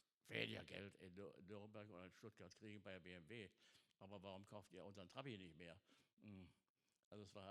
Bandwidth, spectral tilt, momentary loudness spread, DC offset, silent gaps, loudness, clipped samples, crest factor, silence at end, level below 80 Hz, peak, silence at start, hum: 13 kHz; -5 dB/octave; 13 LU; under 0.1%; 6.13-6.17 s, 6.70-6.75 s, 7.04-7.11 s; -58 LUFS; under 0.1%; 30 dB; 0 s; under -90 dBFS; -28 dBFS; 0.25 s; none